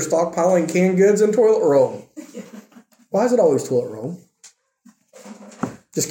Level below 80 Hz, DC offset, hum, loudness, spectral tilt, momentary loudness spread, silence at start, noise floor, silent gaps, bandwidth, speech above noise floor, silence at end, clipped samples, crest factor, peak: -68 dBFS; under 0.1%; none; -18 LUFS; -5.5 dB/octave; 21 LU; 0 s; -54 dBFS; none; 17 kHz; 37 dB; 0 s; under 0.1%; 14 dB; -4 dBFS